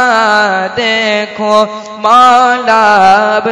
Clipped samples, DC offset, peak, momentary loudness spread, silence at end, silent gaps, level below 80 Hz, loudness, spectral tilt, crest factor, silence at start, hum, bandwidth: 3%; under 0.1%; 0 dBFS; 7 LU; 0 s; none; -52 dBFS; -8 LUFS; -3 dB/octave; 8 dB; 0 s; none; 12 kHz